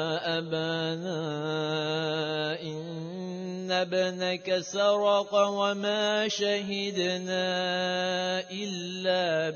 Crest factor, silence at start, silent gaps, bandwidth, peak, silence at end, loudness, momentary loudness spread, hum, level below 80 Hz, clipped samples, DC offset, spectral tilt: 16 dB; 0 s; none; 7 kHz; -12 dBFS; 0 s; -29 LUFS; 9 LU; none; -78 dBFS; under 0.1%; under 0.1%; -4 dB/octave